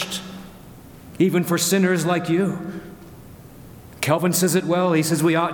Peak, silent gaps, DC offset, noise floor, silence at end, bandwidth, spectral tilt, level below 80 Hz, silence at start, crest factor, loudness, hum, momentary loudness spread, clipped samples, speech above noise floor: -4 dBFS; none; under 0.1%; -42 dBFS; 0 s; 19 kHz; -5 dB/octave; -54 dBFS; 0 s; 18 dB; -20 LUFS; none; 18 LU; under 0.1%; 23 dB